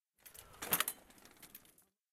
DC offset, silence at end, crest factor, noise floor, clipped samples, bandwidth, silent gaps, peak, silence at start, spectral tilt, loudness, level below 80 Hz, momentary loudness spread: under 0.1%; 0.55 s; 32 dB; -70 dBFS; under 0.1%; 16 kHz; none; -12 dBFS; 0.25 s; -0.5 dB/octave; -37 LUFS; -74 dBFS; 23 LU